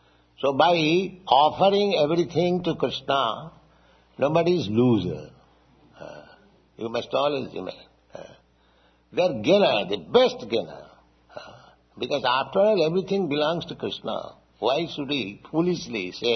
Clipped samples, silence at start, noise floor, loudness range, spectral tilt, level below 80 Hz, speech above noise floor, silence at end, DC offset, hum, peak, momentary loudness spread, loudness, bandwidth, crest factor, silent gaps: under 0.1%; 0.4 s; -61 dBFS; 8 LU; -6 dB/octave; -60 dBFS; 37 dB; 0 s; under 0.1%; none; -4 dBFS; 18 LU; -23 LUFS; 6.4 kHz; 22 dB; none